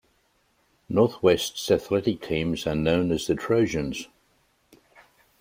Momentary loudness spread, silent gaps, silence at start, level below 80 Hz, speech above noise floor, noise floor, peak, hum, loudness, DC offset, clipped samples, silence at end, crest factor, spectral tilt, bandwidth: 7 LU; none; 0.9 s; -50 dBFS; 43 dB; -67 dBFS; -6 dBFS; none; -24 LUFS; under 0.1%; under 0.1%; 1.35 s; 20 dB; -5.5 dB/octave; 16 kHz